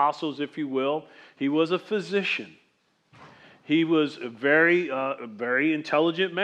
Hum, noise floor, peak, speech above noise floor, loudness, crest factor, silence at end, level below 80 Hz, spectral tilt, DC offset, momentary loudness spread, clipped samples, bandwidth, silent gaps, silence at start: none; -68 dBFS; -6 dBFS; 43 dB; -25 LUFS; 18 dB; 0 s; -86 dBFS; -6 dB/octave; under 0.1%; 10 LU; under 0.1%; 8.8 kHz; none; 0 s